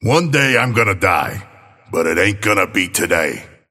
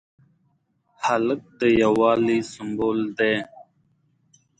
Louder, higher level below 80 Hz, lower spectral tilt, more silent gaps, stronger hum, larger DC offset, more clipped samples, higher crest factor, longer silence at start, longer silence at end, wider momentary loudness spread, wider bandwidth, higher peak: first, -15 LUFS vs -22 LUFS; first, -46 dBFS vs -56 dBFS; about the same, -4.5 dB/octave vs -5.5 dB/octave; neither; neither; neither; neither; about the same, 16 dB vs 18 dB; second, 0 s vs 1 s; second, 0.25 s vs 0.95 s; about the same, 11 LU vs 9 LU; first, 16.5 kHz vs 9.2 kHz; first, 0 dBFS vs -6 dBFS